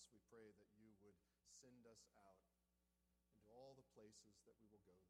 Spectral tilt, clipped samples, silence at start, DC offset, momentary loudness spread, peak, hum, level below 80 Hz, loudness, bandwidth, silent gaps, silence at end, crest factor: -3.5 dB/octave; under 0.1%; 0 s; under 0.1%; 2 LU; -54 dBFS; none; under -90 dBFS; -68 LUFS; 11.5 kHz; none; 0 s; 18 dB